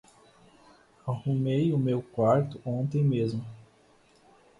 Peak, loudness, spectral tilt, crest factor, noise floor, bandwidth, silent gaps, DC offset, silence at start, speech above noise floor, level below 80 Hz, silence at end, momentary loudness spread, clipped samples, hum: -12 dBFS; -28 LUFS; -9.5 dB/octave; 18 dB; -61 dBFS; 10.5 kHz; none; under 0.1%; 1.05 s; 34 dB; -62 dBFS; 1 s; 12 LU; under 0.1%; none